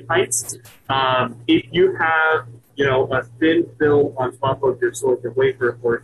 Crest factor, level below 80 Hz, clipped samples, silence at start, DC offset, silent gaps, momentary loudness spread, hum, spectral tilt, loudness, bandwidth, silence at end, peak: 14 dB; -52 dBFS; under 0.1%; 0 s; under 0.1%; none; 6 LU; none; -4.5 dB/octave; -19 LUFS; 14 kHz; 0.05 s; -6 dBFS